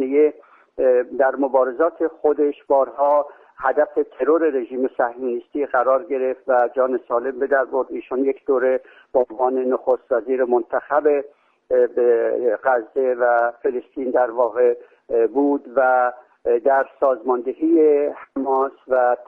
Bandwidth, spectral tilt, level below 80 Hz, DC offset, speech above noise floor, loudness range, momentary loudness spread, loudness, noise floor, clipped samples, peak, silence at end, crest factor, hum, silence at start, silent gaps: 3.3 kHz; -8 dB/octave; -64 dBFS; under 0.1%; 21 dB; 2 LU; 6 LU; -20 LUFS; -40 dBFS; under 0.1%; -4 dBFS; 0.05 s; 16 dB; none; 0 s; none